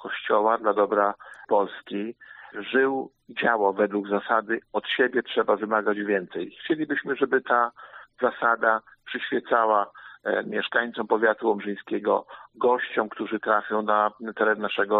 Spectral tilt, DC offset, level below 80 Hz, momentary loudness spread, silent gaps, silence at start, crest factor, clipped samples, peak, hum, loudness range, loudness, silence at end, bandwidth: -2 dB/octave; under 0.1%; -74 dBFS; 11 LU; none; 0 s; 18 dB; under 0.1%; -6 dBFS; none; 1 LU; -25 LUFS; 0 s; 4.3 kHz